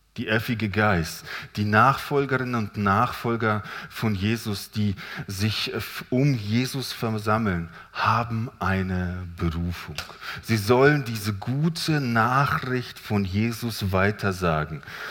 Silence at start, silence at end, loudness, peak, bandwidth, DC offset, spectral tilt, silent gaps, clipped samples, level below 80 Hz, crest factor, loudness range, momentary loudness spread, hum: 0.15 s; 0 s; -25 LUFS; -4 dBFS; 18 kHz; under 0.1%; -6 dB/octave; none; under 0.1%; -52 dBFS; 22 dB; 3 LU; 11 LU; none